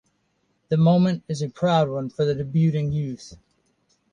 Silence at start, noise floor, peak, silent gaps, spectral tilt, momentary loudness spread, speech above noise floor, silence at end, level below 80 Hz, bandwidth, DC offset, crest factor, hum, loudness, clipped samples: 0.7 s; -70 dBFS; -6 dBFS; none; -8 dB/octave; 10 LU; 48 dB; 0.75 s; -54 dBFS; 9.2 kHz; under 0.1%; 16 dB; none; -22 LUFS; under 0.1%